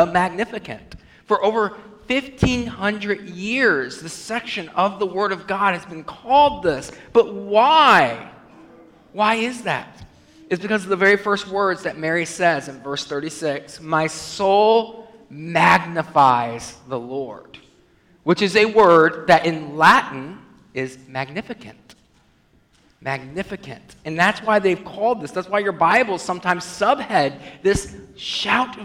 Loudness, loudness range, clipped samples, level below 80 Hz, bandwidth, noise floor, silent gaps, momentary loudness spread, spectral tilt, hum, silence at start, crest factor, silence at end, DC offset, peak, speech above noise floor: -19 LUFS; 6 LU; under 0.1%; -48 dBFS; 16 kHz; -58 dBFS; none; 16 LU; -4.5 dB/octave; none; 0 s; 18 dB; 0 s; under 0.1%; -2 dBFS; 38 dB